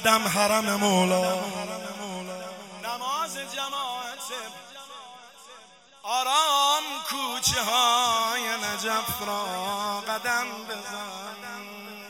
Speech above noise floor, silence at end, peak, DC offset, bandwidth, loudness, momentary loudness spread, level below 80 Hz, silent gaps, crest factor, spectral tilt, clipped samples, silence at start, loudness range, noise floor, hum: 26 dB; 0 s; -4 dBFS; under 0.1%; 16.5 kHz; -26 LUFS; 18 LU; -62 dBFS; none; 22 dB; -2 dB/octave; under 0.1%; 0 s; 9 LU; -52 dBFS; none